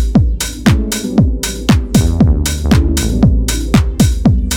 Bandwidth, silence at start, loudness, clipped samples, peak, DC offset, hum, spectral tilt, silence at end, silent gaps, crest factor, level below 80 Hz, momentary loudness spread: 19 kHz; 0 s; -13 LUFS; under 0.1%; 0 dBFS; under 0.1%; none; -5.5 dB/octave; 0 s; none; 12 dB; -16 dBFS; 4 LU